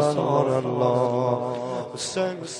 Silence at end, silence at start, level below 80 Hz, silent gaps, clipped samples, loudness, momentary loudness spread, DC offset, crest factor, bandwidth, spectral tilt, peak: 0 s; 0 s; -68 dBFS; none; under 0.1%; -24 LUFS; 8 LU; under 0.1%; 18 dB; 11.5 kHz; -5.5 dB/octave; -6 dBFS